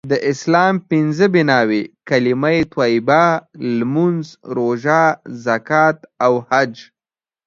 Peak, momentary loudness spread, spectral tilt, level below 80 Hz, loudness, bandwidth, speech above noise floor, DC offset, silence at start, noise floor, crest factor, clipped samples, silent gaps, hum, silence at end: 0 dBFS; 8 LU; -6.5 dB/octave; -56 dBFS; -16 LUFS; 7.6 kHz; over 74 dB; under 0.1%; 0.05 s; under -90 dBFS; 16 dB; under 0.1%; none; none; 0.65 s